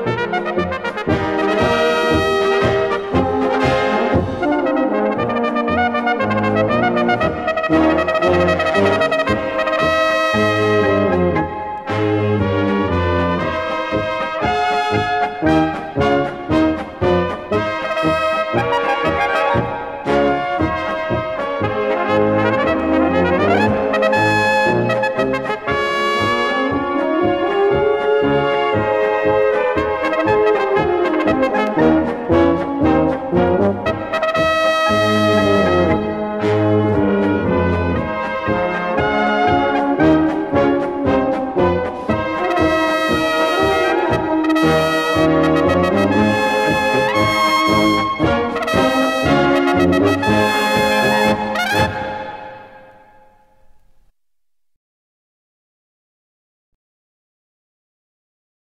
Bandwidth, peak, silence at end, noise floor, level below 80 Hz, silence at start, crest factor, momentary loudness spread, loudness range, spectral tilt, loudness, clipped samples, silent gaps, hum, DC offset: 15.5 kHz; -2 dBFS; 5.8 s; -83 dBFS; -40 dBFS; 0 s; 14 dB; 5 LU; 3 LU; -6 dB/octave; -16 LUFS; under 0.1%; none; none; under 0.1%